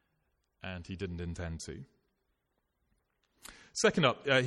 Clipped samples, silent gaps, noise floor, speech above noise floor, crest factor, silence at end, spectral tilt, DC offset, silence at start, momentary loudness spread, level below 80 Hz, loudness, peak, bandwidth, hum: under 0.1%; none; -81 dBFS; 49 dB; 22 dB; 0 s; -4 dB/octave; under 0.1%; 0.65 s; 24 LU; -56 dBFS; -33 LUFS; -14 dBFS; 13 kHz; none